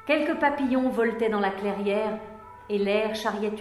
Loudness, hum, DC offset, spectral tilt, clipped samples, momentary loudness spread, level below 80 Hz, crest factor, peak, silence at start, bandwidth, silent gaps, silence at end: -26 LUFS; none; under 0.1%; -6 dB/octave; under 0.1%; 8 LU; -58 dBFS; 16 dB; -10 dBFS; 0 s; 13 kHz; none; 0 s